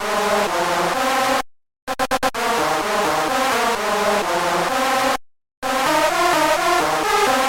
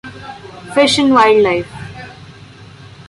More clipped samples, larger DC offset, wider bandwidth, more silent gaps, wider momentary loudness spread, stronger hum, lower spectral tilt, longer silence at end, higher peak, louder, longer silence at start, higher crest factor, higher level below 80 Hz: neither; neither; first, 17 kHz vs 11.5 kHz; first, 1.82-1.87 s, 5.57-5.62 s vs none; second, 7 LU vs 23 LU; neither; second, -2.5 dB/octave vs -4 dB/octave; second, 0 s vs 0.45 s; second, -6 dBFS vs -2 dBFS; second, -19 LUFS vs -12 LUFS; about the same, 0 s vs 0.05 s; about the same, 14 dB vs 14 dB; about the same, -48 dBFS vs -48 dBFS